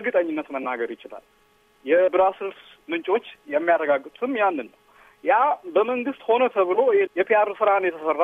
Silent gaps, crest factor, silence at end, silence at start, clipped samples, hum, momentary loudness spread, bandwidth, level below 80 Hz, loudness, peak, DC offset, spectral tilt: none; 16 dB; 0 s; 0 s; under 0.1%; none; 12 LU; 3.9 kHz; -70 dBFS; -22 LUFS; -8 dBFS; under 0.1%; -6 dB/octave